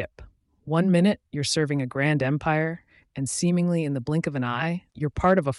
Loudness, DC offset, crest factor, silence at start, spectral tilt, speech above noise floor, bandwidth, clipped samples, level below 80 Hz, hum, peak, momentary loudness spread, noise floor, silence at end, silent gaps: -25 LUFS; under 0.1%; 16 dB; 0 s; -5.5 dB/octave; 26 dB; 11.5 kHz; under 0.1%; -50 dBFS; none; -8 dBFS; 9 LU; -49 dBFS; 0 s; none